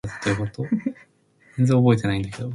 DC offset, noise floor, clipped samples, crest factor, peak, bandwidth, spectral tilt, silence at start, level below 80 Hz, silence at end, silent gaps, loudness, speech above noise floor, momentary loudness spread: under 0.1%; -58 dBFS; under 0.1%; 18 dB; -4 dBFS; 11.5 kHz; -7.5 dB/octave; 0.05 s; -48 dBFS; 0 s; none; -22 LUFS; 37 dB; 10 LU